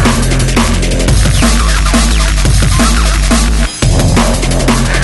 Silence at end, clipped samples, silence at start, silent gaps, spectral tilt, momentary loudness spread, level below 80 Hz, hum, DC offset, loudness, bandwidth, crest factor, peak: 0 s; under 0.1%; 0 s; none; -4.5 dB/octave; 2 LU; -12 dBFS; none; under 0.1%; -10 LUFS; 12 kHz; 8 dB; 0 dBFS